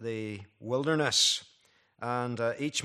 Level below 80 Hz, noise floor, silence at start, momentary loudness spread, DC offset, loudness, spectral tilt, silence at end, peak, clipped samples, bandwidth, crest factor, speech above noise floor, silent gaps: -76 dBFS; -66 dBFS; 0 s; 16 LU; under 0.1%; -29 LUFS; -3 dB/octave; 0 s; -12 dBFS; under 0.1%; 14.5 kHz; 20 dB; 36 dB; none